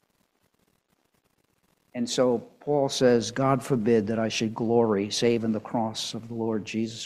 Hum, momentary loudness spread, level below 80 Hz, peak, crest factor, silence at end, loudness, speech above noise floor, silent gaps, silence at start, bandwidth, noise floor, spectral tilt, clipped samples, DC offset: none; 9 LU; -62 dBFS; -8 dBFS; 18 dB; 0 s; -26 LUFS; 45 dB; none; 1.95 s; 14 kHz; -71 dBFS; -5 dB/octave; under 0.1%; under 0.1%